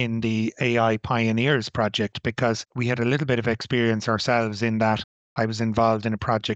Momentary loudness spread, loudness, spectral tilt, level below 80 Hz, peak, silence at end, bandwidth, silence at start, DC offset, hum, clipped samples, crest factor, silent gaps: 5 LU; -23 LUFS; -6 dB/octave; -52 dBFS; -6 dBFS; 0 s; 8.2 kHz; 0 s; under 0.1%; none; under 0.1%; 16 dB; 5.04-5.36 s